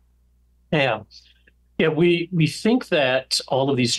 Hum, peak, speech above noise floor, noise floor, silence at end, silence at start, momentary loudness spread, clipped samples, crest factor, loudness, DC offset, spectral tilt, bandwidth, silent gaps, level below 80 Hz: 60 Hz at -45 dBFS; -8 dBFS; 39 dB; -60 dBFS; 0 s; 0.7 s; 5 LU; under 0.1%; 14 dB; -21 LUFS; under 0.1%; -5 dB/octave; 12.5 kHz; none; -58 dBFS